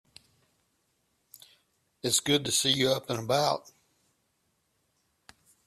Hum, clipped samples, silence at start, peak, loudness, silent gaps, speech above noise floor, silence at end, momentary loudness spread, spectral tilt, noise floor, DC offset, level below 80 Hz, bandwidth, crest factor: none; under 0.1%; 2.05 s; -12 dBFS; -27 LUFS; none; 48 dB; 2.05 s; 7 LU; -2.5 dB/octave; -75 dBFS; under 0.1%; -68 dBFS; 14.5 kHz; 22 dB